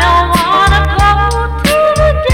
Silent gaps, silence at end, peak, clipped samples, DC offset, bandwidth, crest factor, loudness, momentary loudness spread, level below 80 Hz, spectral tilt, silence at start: none; 0 s; -2 dBFS; under 0.1%; under 0.1%; 17 kHz; 8 dB; -10 LUFS; 3 LU; -16 dBFS; -5 dB/octave; 0 s